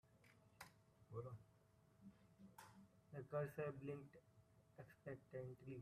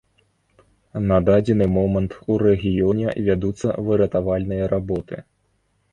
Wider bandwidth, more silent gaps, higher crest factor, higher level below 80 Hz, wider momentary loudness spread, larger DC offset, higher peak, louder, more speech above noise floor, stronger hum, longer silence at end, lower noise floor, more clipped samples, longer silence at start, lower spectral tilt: first, 14 kHz vs 9.6 kHz; neither; about the same, 20 dB vs 16 dB; second, -84 dBFS vs -40 dBFS; first, 19 LU vs 9 LU; neither; second, -36 dBFS vs -4 dBFS; second, -55 LUFS vs -20 LUFS; second, 23 dB vs 47 dB; neither; second, 0 s vs 0.7 s; first, -75 dBFS vs -66 dBFS; neither; second, 0.05 s vs 0.95 s; second, -7.5 dB/octave vs -9 dB/octave